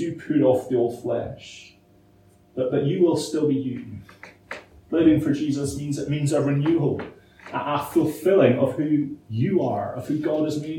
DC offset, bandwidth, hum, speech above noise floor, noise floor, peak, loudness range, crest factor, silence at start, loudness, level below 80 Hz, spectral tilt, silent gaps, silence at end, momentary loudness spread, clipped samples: under 0.1%; 17 kHz; none; 33 dB; -55 dBFS; -4 dBFS; 4 LU; 18 dB; 0 s; -23 LUFS; -56 dBFS; -7 dB/octave; none; 0 s; 19 LU; under 0.1%